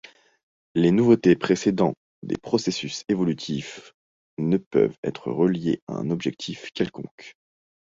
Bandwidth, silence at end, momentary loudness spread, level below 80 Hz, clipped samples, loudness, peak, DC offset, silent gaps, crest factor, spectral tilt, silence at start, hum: 7.8 kHz; 0.65 s; 15 LU; -60 dBFS; under 0.1%; -24 LUFS; -6 dBFS; under 0.1%; 1.97-2.22 s, 3.94-4.37 s, 4.66-4.71 s, 4.98-5.03 s, 5.82-5.87 s, 7.11-7.18 s; 20 dB; -6.5 dB/octave; 0.75 s; none